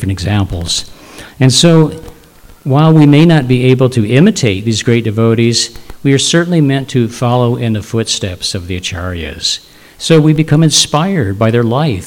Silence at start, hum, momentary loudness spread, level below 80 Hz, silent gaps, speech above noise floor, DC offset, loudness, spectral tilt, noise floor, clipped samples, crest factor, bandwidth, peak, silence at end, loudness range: 0 s; none; 11 LU; -38 dBFS; none; 28 dB; under 0.1%; -11 LUFS; -5 dB/octave; -39 dBFS; 0.8%; 10 dB; 16 kHz; 0 dBFS; 0 s; 5 LU